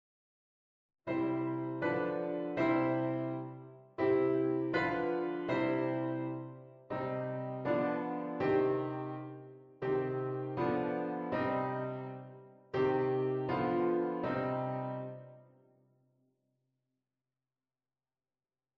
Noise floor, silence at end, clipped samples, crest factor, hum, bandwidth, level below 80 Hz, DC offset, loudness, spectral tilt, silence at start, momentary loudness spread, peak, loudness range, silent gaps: under -90 dBFS; 3.35 s; under 0.1%; 16 dB; none; 5.8 kHz; -70 dBFS; under 0.1%; -35 LUFS; -9 dB/octave; 1.05 s; 14 LU; -18 dBFS; 4 LU; none